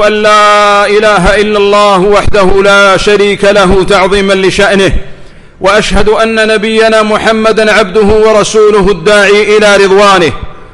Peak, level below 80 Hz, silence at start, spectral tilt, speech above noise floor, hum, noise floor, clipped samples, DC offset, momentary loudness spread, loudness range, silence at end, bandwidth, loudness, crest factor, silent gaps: 0 dBFS; -22 dBFS; 0 s; -4 dB/octave; 23 dB; none; -28 dBFS; 0.7%; under 0.1%; 4 LU; 3 LU; 0.05 s; 11.5 kHz; -5 LUFS; 6 dB; none